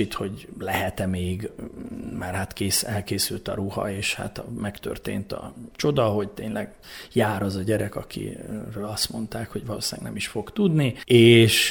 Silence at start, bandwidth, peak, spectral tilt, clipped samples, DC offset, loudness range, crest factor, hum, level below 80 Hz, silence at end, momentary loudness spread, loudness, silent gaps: 0 s; over 20 kHz; -4 dBFS; -4.5 dB/octave; under 0.1%; under 0.1%; 4 LU; 20 dB; none; -50 dBFS; 0 s; 13 LU; -24 LUFS; none